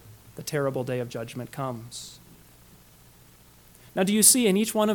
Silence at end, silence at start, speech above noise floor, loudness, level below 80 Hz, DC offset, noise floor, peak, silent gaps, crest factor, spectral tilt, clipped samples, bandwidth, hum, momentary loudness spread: 0 s; 0.05 s; 29 dB; -23 LUFS; -62 dBFS; under 0.1%; -54 dBFS; -4 dBFS; none; 24 dB; -3.5 dB/octave; under 0.1%; 19 kHz; 60 Hz at -60 dBFS; 22 LU